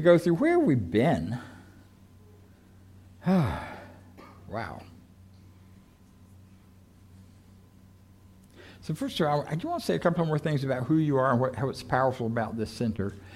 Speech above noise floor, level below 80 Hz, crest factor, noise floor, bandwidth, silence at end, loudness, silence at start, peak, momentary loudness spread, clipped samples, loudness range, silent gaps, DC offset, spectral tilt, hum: 29 dB; -56 dBFS; 20 dB; -55 dBFS; 15 kHz; 0 s; -27 LUFS; 0 s; -8 dBFS; 16 LU; under 0.1%; 18 LU; none; under 0.1%; -7.5 dB/octave; none